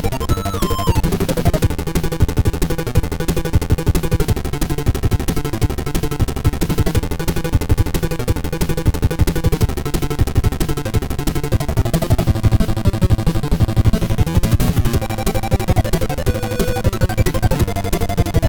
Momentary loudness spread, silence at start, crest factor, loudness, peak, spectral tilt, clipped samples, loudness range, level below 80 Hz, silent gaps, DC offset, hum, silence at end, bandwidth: 5 LU; 0 s; 16 dB; -19 LUFS; 0 dBFS; -6 dB/octave; under 0.1%; 2 LU; -22 dBFS; none; under 0.1%; none; 0 s; 20 kHz